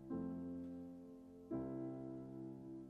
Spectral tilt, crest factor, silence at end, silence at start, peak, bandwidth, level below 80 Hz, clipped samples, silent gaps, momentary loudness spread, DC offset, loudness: -10 dB/octave; 14 dB; 0 s; 0 s; -34 dBFS; 5.2 kHz; -72 dBFS; under 0.1%; none; 10 LU; under 0.1%; -49 LUFS